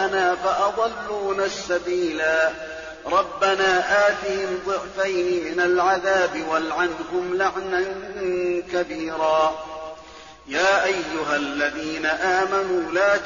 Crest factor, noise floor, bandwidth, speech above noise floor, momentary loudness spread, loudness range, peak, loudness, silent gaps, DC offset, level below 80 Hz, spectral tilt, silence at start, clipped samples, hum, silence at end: 14 dB; -43 dBFS; 7.2 kHz; 21 dB; 9 LU; 3 LU; -8 dBFS; -22 LUFS; none; under 0.1%; -54 dBFS; -1.5 dB/octave; 0 s; under 0.1%; none; 0 s